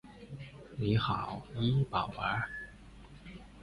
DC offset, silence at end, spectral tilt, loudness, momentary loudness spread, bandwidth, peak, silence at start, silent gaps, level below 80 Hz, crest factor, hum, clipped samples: under 0.1%; 0 s; -7.5 dB/octave; -34 LUFS; 20 LU; 11 kHz; -16 dBFS; 0.05 s; none; -54 dBFS; 18 dB; none; under 0.1%